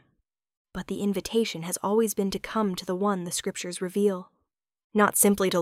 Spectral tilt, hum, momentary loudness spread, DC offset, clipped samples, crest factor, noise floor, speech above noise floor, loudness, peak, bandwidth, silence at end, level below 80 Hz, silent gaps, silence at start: -4 dB/octave; none; 11 LU; under 0.1%; under 0.1%; 22 dB; -78 dBFS; 52 dB; -26 LUFS; -6 dBFS; 16 kHz; 0 s; -58 dBFS; 4.84-4.90 s; 0.75 s